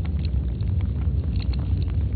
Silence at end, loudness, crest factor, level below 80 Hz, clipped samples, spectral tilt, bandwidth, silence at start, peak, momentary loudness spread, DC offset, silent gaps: 0 s; -26 LUFS; 10 dB; -26 dBFS; under 0.1%; -8.5 dB/octave; 4.7 kHz; 0 s; -12 dBFS; 1 LU; under 0.1%; none